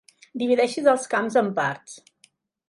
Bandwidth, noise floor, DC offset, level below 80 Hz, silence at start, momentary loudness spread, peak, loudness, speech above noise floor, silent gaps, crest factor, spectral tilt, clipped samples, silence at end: 11.5 kHz; -62 dBFS; under 0.1%; -76 dBFS; 0.35 s; 18 LU; -6 dBFS; -22 LUFS; 39 dB; none; 18 dB; -4.5 dB/octave; under 0.1%; 0.7 s